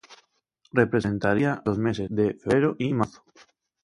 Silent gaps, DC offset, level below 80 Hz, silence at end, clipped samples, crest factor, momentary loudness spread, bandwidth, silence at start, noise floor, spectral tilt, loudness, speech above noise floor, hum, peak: none; under 0.1%; -54 dBFS; 0.75 s; under 0.1%; 20 dB; 4 LU; 11.5 kHz; 0.1 s; -67 dBFS; -7.5 dB/octave; -25 LUFS; 43 dB; none; -6 dBFS